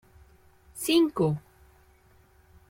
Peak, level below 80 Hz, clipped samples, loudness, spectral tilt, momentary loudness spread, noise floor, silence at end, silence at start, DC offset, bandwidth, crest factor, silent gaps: -10 dBFS; -60 dBFS; under 0.1%; -26 LUFS; -5.5 dB/octave; 14 LU; -60 dBFS; 1.3 s; 0.75 s; under 0.1%; 16.5 kHz; 20 dB; none